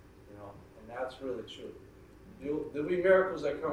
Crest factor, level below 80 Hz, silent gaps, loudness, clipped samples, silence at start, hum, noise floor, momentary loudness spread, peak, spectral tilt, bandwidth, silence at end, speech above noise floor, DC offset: 20 dB; -62 dBFS; none; -32 LUFS; under 0.1%; 0.05 s; none; -54 dBFS; 24 LU; -12 dBFS; -6.5 dB/octave; 10.5 kHz; 0 s; 22 dB; under 0.1%